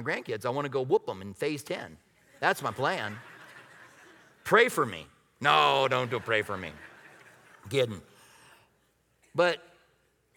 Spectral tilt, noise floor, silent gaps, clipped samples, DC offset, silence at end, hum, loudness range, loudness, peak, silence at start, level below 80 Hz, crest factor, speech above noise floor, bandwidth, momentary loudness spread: -4.5 dB/octave; -70 dBFS; none; under 0.1%; under 0.1%; 0.8 s; none; 7 LU; -28 LUFS; -6 dBFS; 0 s; -70 dBFS; 24 dB; 42 dB; 19.5 kHz; 22 LU